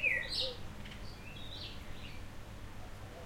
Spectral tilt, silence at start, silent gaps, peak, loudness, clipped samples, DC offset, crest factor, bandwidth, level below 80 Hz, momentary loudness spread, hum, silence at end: -3.5 dB/octave; 0 s; none; -20 dBFS; -41 LUFS; under 0.1%; under 0.1%; 20 dB; 16.5 kHz; -52 dBFS; 16 LU; none; 0 s